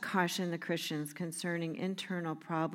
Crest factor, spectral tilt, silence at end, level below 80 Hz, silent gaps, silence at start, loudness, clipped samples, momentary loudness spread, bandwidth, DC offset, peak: 20 dB; -4.5 dB/octave; 0 s; -86 dBFS; none; 0 s; -36 LUFS; under 0.1%; 6 LU; 16.5 kHz; under 0.1%; -16 dBFS